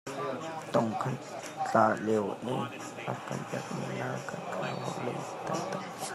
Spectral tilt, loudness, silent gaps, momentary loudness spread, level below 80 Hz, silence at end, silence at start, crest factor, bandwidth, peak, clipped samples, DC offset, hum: -5.5 dB/octave; -33 LUFS; none; 11 LU; -76 dBFS; 0 s; 0.05 s; 22 dB; 14.5 kHz; -10 dBFS; under 0.1%; under 0.1%; none